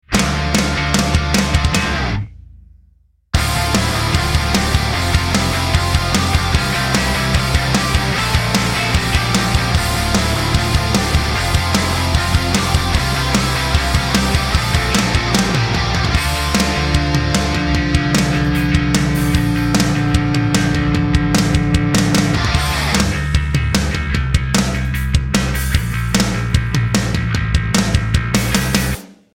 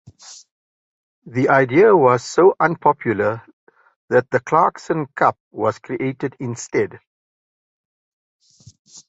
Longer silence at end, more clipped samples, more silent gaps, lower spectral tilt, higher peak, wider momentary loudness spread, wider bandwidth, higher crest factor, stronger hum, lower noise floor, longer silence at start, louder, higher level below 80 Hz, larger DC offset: about the same, 0.2 s vs 0.1 s; neither; second, none vs 0.51-1.22 s, 3.53-3.67 s, 3.96-4.08 s, 5.40-5.51 s, 7.07-8.39 s, 8.79-8.85 s; second, -4.5 dB/octave vs -6.5 dB/octave; about the same, 0 dBFS vs -2 dBFS; second, 3 LU vs 13 LU; first, 17 kHz vs 8 kHz; about the same, 16 dB vs 18 dB; neither; second, -53 dBFS vs under -90 dBFS; second, 0.1 s vs 0.3 s; about the same, -16 LUFS vs -18 LUFS; first, -24 dBFS vs -60 dBFS; neither